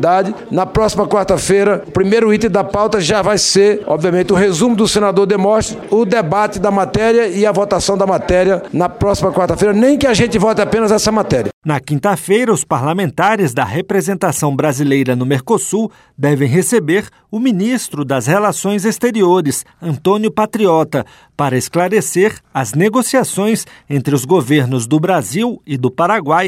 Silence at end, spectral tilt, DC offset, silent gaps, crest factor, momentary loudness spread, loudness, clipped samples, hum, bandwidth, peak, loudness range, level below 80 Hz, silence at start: 0 s; -5 dB/octave; under 0.1%; 11.53-11.62 s; 12 dB; 6 LU; -14 LUFS; under 0.1%; none; 16 kHz; -2 dBFS; 3 LU; -40 dBFS; 0 s